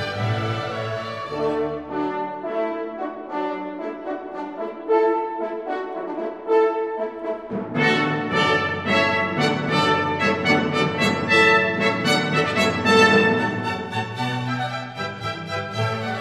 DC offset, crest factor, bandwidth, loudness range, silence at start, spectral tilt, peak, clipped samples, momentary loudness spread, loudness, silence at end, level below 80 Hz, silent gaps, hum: under 0.1%; 18 dB; 13.5 kHz; 9 LU; 0 s; -5 dB/octave; -4 dBFS; under 0.1%; 12 LU; -22 LUFS; 0 s; -58 dBFS; none; none